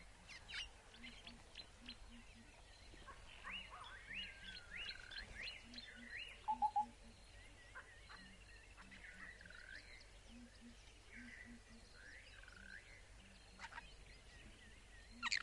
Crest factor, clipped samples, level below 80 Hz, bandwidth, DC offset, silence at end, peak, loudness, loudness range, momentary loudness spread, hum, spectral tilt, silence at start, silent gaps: 28 dB; under 0.1%; -64 dBFS; 11.5 kHz; under 0.1%; 0 s; -24 dBFS; -52 LUFS; 11 LU; 14 LU; none; -2 dB/octave; 0 s; none